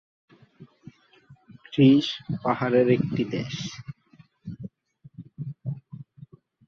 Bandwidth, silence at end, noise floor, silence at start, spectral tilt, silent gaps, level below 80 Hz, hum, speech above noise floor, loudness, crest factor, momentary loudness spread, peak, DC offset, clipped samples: 7 kHz; 0.65 s; -57 dBFS; 0.6 s; -7 dB/octave; none; -62 dBFS; none; 35 dB; -24 LUFS; 22 dB; 26 LU; -6 dBFS; under 0.1%; under 0.1%